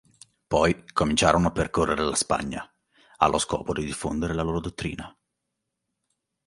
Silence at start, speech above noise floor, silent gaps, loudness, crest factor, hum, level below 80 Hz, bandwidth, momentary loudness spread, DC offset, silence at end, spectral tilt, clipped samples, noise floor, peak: 0.5 s; 57 dB; none; -25 LUFS; 24 dB; none; -44 dBFS; 11.5 kHz; 13 LU; under 0.1%; 1.4 s; -4.5 dB/octave; under 0.1%; -82 dBFS; -2 dBFS